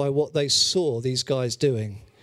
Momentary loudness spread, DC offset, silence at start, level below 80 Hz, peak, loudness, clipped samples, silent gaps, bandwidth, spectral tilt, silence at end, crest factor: 8 LU; under 0.1%; 0 s; -60 dBFS; -8 dBFS; -23 LUFS; under 0.1%; none; 14.5 kHz; -4 dB/octave; 0.2 s; 16 dB